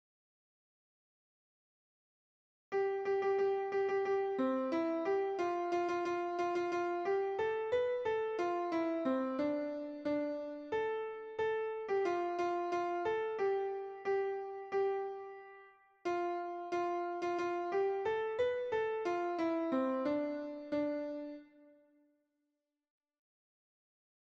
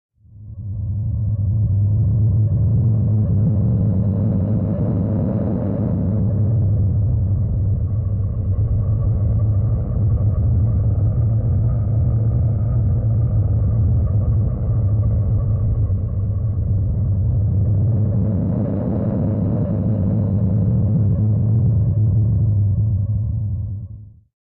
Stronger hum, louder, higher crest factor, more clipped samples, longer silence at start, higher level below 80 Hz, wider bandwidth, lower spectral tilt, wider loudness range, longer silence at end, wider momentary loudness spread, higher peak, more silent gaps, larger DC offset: neither; second, -36 LUFS vs -19 LUFS; first, 14 dB vs 8 dB; neither; first, 2.7 s vs 0.35 s; second, -78 dBFS vs -26 dBFS; first, 7.6 kHz vs 1.7 kHz; second, -5.5 dB/octave vs -15.5 dB/octave; about the same, 4 LU vs 2 LU; first, 2.75 s vs 0.35 s; about the same, 6 LU vs 4 LU; second, -24 dBFS vs -10 dBFS; neither; neither